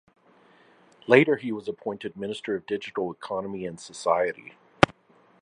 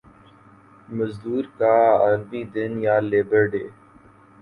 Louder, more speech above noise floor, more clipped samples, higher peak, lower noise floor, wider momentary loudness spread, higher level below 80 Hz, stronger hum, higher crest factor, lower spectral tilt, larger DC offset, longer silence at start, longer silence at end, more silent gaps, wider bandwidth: second, -26 LUFS vs -21 LUFS; first, 34 dB vs 30 dB; neither; first, 0 dBFS vs -6 dBFS; first, -60 dBFS vs -51 dBFS; about the same, 15 LU vs 13 LU; about the same, -56 dBFS vs -58 dBFS; neither; first, 28 dB vs 16 dB; second, -5.5 dB/octave vs -9 dB/octave; neither; first, 1.1 s vs 0.9 s; second, 0.5 s vs 0.7 s; neither; first, 11 kHz vs 4.9 kHz